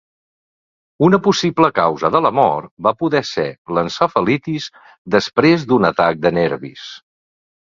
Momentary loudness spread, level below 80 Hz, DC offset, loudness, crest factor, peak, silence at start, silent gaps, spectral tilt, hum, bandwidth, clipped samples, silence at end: 11 LU; -54 dBFS; under 0.1%; -16 LUFS; 18 dB; 0 dBFS; 1 s; 2.71-2.77 s, 3.58-3.65 s, 4.98-5.05 s; -6 dB/octave; none; 7.6 kHz; under 0.1%; 0.75 s